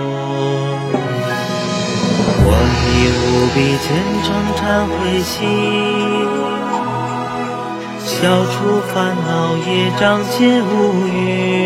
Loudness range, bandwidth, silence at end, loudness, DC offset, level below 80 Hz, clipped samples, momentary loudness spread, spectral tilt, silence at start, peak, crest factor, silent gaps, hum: 3 LU; 16 kHz; 0 s; -16 LUFS; under 0.1%; -30 dBFS; under 0.1%; 7 LU; -5.5 dB/octave; 0 s; 0 dBFS; 16 dB; none; none